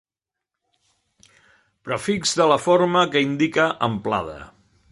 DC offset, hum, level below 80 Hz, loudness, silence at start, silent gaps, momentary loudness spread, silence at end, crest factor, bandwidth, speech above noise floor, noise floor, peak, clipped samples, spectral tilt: under 0.1%; none; -56 dBFS; -20 LUFS; 1.85 s; none; 13 LU; 0.45 s; 20 dB; 11.5 kHz; 66 dB; -86 dBFS; -2 dBFS; under 0.1%; -4.5 dB/octave